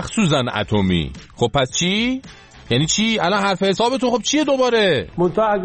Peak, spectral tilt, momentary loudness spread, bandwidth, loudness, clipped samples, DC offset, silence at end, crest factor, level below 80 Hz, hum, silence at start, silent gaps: -4 dBFS; -4.5 dB/octave; 5 LU; 8.8 kHz; -18 LUFS; under 0.1%; under 0.1%; 0 s; 16 dB; -42 dBFS; none; 0 s; none